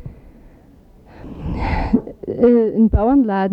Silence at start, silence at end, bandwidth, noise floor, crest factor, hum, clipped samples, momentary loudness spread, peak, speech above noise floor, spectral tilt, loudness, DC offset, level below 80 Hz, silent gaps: 0 s; 0 s; 5.6 kHz; -46 dBFS; 16 dB; none; under 0.1%; 15 LU; -2 dBFS; 33 dB; -10 dB/octave; -17 LUFS; under 0.1%; -30 dBFS; none